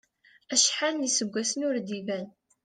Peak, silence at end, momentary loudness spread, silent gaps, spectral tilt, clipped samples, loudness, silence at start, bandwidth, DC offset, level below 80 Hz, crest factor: -8 dBFS; 0.35 s; 12 LU; none; -1.5 dB/octave; under 0.1%; -27 LUFS; 0.5 s; 11 kHz; under 0.1%; -78 dBFS; 22 dB